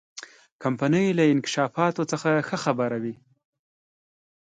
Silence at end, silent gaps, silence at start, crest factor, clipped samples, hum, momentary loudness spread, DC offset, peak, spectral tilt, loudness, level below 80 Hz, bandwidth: 1.35 s; 0.52-0.59 s; 0.15 s; 18 dB; under 0.1%; none; 11 LU; under 0.1%; -8 dBFS; -5.5 dB/octave; -24 LUFS; -70 dBFS; 9.4 kHz